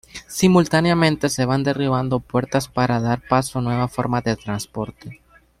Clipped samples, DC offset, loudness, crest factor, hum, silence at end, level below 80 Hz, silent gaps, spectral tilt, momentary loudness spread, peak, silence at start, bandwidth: under 0.1%; under 0.1%; -20 LUFS; 18 dB; none; 0.45 s; -48 dBFS; none; -5.5 dB/octave; 13 LU; -2 dBFS; 0.15 s; 15.5 kHz